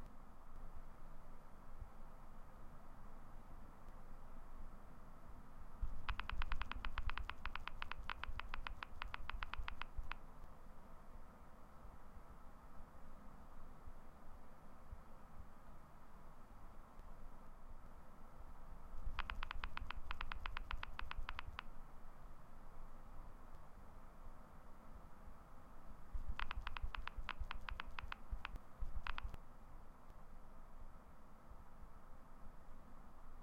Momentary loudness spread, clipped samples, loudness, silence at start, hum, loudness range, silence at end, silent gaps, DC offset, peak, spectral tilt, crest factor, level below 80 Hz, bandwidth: 14 LU; under 0.1%; -54 LUFS; 0 s; none; 13 LU; 0 s; none; under 0.1%; -22 dBFS; -5 dB/octave; 24 dB; -50 dBFS; 5.6 kHz